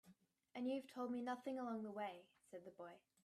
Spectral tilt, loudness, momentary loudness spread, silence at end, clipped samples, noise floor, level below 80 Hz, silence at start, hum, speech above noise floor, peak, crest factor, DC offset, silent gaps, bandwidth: -6 dB/octave; -48 LUFS; 13 LU; 0.25 s; under 0.1%; -73 dBFS; under -90 dBFS; 0.05 s; none; 25 dB; -34 dBFS; 14 dB; under 0.1%; none; 13.5 kHz